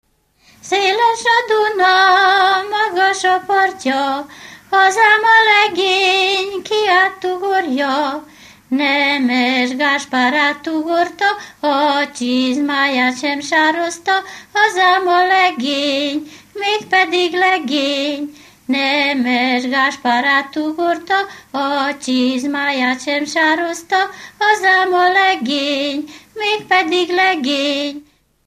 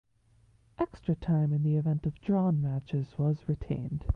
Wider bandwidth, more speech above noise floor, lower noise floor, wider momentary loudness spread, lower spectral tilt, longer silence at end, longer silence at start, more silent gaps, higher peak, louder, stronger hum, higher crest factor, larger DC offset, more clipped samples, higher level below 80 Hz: first, 15 kHz vs 4.7 kHz; about the same, 38 dB vs 35 dB; second, -54 dBFS vs -65 dBFS; about the same, 9 LU vs 7 LU; second, -2 dB/octave vs -11 dB/octave; first, 0.45 s vs 0 s; second, 0.65 s vs 0.8 s; neither; first, 0 dBFS vs -14 dBFS; first, -15 LUFS vs -30 LUFS; neither; about the same, 16 dB vs 16 dB; neither; neither; second, -64 dBFS vs -44 dBFS